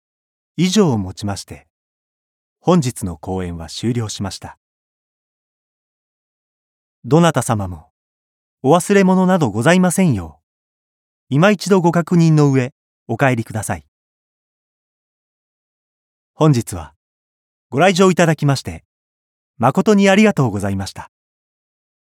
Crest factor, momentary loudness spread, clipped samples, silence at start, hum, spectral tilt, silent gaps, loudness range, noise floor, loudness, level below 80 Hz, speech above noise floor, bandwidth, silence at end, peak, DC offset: 18 dB; 16 LU; under 0.1%; 0.6 s; none; -6 dB/octave; 1.70-2.56 s, 4.57-7.02 s, 7.90-8.57 s, 10.43-11.27 s, 12.72-13.06 s, 13.88-16.34 s, 16.96-17.70 s, 18.85-19.54 s; 9 LU; under -90 dBFS; -16 LUFS; -54 dBFS; over 75 dB; 15.5 kHz; 1.1 s; 0 dBFS; under 0.1%